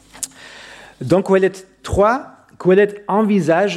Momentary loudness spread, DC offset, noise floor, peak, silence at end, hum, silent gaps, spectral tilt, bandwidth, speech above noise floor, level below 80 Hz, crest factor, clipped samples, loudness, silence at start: 19 LU; under 0.1%; -39 dBFS; -2 dBFS; 0 s; none; none; -6 dB/octave; 14 kHz; 24 dB; -42 dBFS; 14 dB; under 0.1%; -16 LUFS; 0.15 s